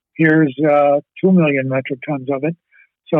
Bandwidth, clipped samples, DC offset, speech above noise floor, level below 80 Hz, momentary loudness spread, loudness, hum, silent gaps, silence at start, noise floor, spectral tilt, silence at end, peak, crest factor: 3.8 kHz; under 0.1%; under 0.1%; 23 dB; -68 dBFS; 10 LU; -16 LUFS; none; none; 0.2 s; -38 dBFS; -10.5 dB/octave; 0 s; -4 dBFS; 12 dB